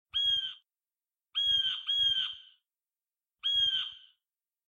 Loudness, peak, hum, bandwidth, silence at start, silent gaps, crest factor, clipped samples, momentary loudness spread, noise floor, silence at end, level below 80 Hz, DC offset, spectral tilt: -28 LUFS; -20 dBFS; none; 16.5 kHz; 0.15 s; none; 14 dB; under 0.1%; 12 LU; under -90 dBFS; 0.7 s; -68 dBFS; under 0.1%; 2 dB/octave